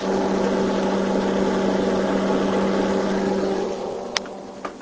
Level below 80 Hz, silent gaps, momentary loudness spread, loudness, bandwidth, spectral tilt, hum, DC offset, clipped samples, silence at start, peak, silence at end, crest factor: -48 dBFS; none; 6 LU; -22 LUFS; 8 kHz; -6 dB/octave; none; under 0.1%; under 0.1%; 0 s; 0 dBFS; 0 s; 22 dB